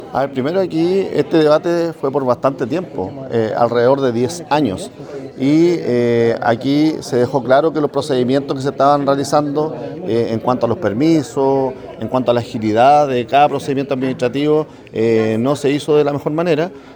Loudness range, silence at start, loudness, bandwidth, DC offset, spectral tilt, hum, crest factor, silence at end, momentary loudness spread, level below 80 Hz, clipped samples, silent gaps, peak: 2 LU; 0 s; -16 LUFS; over 20 kHz; under 0.1%; -6.5 dB/octave; none; 16 dB; 0 s; 7 LU; -54 dBFS; under 0.1%; none; 0 dBFS